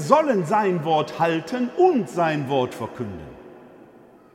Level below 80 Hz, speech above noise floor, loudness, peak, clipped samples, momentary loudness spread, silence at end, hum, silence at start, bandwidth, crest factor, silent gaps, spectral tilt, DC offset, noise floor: -60 dBFS; 28 dB; -22 LUFS; -2 dBFS; under 0.1%; 14 LU; 0.65 s; none; 0 s; 14.5 kHz; 22 dB; none; -6.5 dB/octave; under 0.1%; -49 dBFS